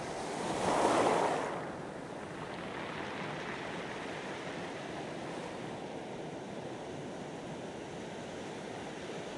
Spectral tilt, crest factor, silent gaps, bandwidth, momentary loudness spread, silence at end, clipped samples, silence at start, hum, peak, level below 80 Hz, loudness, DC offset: -4.5 dB/octave; 24 dB; none; 11.5 kHz; 13 LU; 0 s; under 0.1%; 0 s; none; -14 dBFS; -66 dBFS; -38 LUFS; under 0.1%